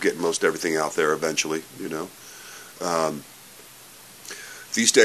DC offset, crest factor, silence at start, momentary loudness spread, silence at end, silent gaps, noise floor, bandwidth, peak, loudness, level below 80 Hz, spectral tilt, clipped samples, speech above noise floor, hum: under 0.1%; 24 dB; 0 s; 21 LU; 0 s; none; -46 dBFS; 14 kHz; 0 dBFS; -24 LUFS; -70 dBFS; -2 dB/octave; under 0.1%; 23 dB; none